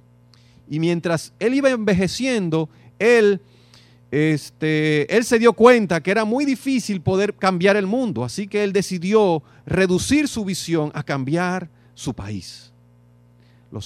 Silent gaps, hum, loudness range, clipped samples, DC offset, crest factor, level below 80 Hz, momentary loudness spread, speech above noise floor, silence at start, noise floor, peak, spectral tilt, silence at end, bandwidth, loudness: none; 60 Hz at -45 dBFS; 5 LU; under 0.1%; under 0.1%; 20 dB; -52 dBFS; 13 LU; 33 dB; 0.7 s; -52 dBFS; 0 dBFS; -5.5 dB/octave; 0 s; 14.5 kHz; -19 LUFS